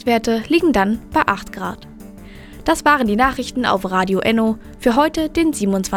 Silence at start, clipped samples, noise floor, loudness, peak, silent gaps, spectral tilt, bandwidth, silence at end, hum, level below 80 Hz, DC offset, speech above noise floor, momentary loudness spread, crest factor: 0.05 s; under 0.1%; -37 dBFS; -17 LUFS; 0 dBFS; none; -5 dB/octave; 17.5 kHz; 0 s; none; -40 dBFS; under 0.1%; 20 dB; 10 LU; 18 dB